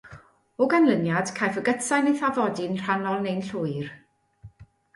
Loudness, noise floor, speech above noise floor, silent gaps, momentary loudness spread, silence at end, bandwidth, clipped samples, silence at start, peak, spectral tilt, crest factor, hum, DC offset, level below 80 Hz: -25 LUFS; -51 dBFS; 27 dB; none; 10 LU; 0.3 s; 11.5 kHz; under 0.1%; 0.05 s; -8 dBFS; -5.5 dB/octave; 18 dB; none; under 0.1%; -64 dBFS